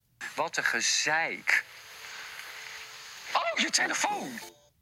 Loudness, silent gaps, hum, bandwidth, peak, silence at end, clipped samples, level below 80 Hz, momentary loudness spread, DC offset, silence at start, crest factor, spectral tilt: -27 LUFS; none; none; 16.5 kHz; -8 dBFS; 0.3 s; under 0.1%; -76 dBFS; 17 LU; under 0.1%; 0.2 s; 24 dB; 0 dB/octave